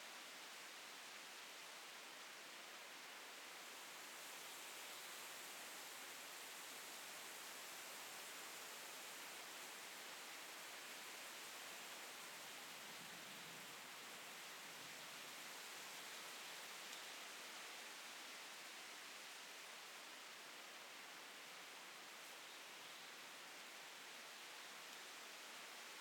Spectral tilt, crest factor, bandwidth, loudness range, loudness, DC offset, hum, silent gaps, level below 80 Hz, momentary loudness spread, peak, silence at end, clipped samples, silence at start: 0.5 dB/octave; 18 dB; 19 kHz; 3 LU; -53 LUFS; under 0.1%; none; none; under -90 dBFS; 3 LU; -38 dBFS; 0 s; under 0.1%; 0 s